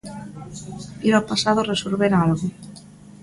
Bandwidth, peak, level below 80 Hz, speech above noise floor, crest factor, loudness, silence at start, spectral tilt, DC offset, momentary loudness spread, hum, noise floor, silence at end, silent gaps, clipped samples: 11.5 kHz; -2 dBFS; -52 dBFS; 22 dB; 20 dB; -20 LUFS; 0.05 s; -5.5 dB/octave; under 0.1%; 18 LU; none; -43 dBFS; 0.05 s; none; under 0.1%